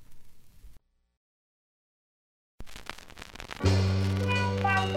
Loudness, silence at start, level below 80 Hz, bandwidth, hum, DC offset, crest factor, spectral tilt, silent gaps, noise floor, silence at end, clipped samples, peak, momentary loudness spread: -27 LUFS; 0 s; -50 dBFS; 12 kHz; none; under 0.1%; 20 dB; -6 dB/octave; 1.17-2.58 s; -52 dBFS; 0 s; under 0.1%; -12 dBFS; 20 LU